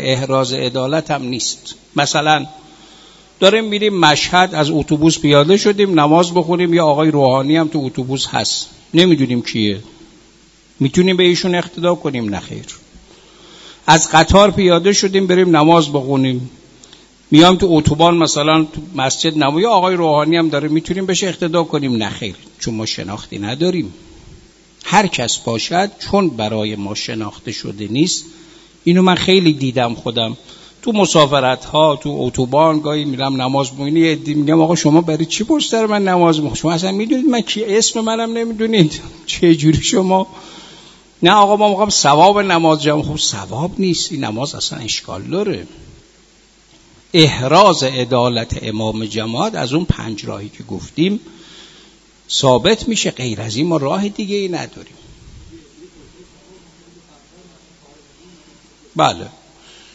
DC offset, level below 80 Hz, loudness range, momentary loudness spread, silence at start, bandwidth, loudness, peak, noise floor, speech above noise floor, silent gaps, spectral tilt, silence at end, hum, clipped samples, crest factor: under 0.1%; -42 dBFS; 8 LU; 12 LU; 0 s; 8 kHz; -14 LUFS; 0 dBFS; -49 dBFS; 35 dB; none; -4.5 dB/octave; 0.65 s; none; under 0.1%; 16 dB